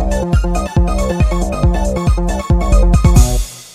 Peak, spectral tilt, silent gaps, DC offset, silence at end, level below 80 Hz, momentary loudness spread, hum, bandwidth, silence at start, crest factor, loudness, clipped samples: 0 dBFS; -6.5 dB/octave; none; under 0.1%; 0.05 s; -14 dBFS; 5 LU; none; 14.5 kHz; 0 s; 12 dB; -15 LUFS; under 0.1%